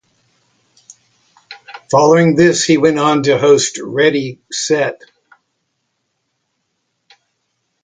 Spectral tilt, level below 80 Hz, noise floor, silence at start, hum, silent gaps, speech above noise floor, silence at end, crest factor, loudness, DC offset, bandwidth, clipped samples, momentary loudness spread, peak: -4.5 dB/octave; -58 dBFS; -70 dBFS; 1.5 s; none; none; 57 dB; 2.9 s; 16 dB; -13 LUFS; under 0.1%; 9.6 kHz; under 0.1%; 12 LU; 0 dBFS